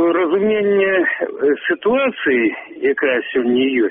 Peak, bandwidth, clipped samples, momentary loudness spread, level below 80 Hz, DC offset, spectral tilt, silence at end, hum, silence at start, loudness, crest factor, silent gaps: -4 dBFS; 3.8 kHz; under 0.1%; 4 LU; -58 dBFS; under 0.1%; -3 dB/octave; 0 s; none; 0 s; -17 LUFS; 12 dB; none